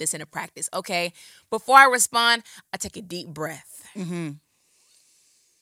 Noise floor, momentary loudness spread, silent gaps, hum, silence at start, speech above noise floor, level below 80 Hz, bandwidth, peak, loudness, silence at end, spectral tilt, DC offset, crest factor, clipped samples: -63 dBFS; 21 LU; none; none; 0 s; 40 dB; -64 dBFS; 17 kHz; 0 dBFS; -21 LUFS; 1.25 s; -1.5 dB/octave; under 0.1%; 24 dB; under 0.1%